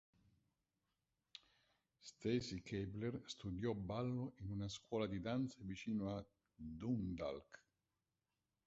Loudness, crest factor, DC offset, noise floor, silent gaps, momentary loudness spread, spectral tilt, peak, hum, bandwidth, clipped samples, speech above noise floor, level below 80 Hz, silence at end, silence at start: -45 LUFS; 20 dB; under 0.1%; under -90 dBFS; none; 18 LU; -6.5 dB/octave; -28 dBFS; none; 7.6 kHz; under 0.1%; over 45 dB; -66 dBFS; 1.1 s; 2.05 s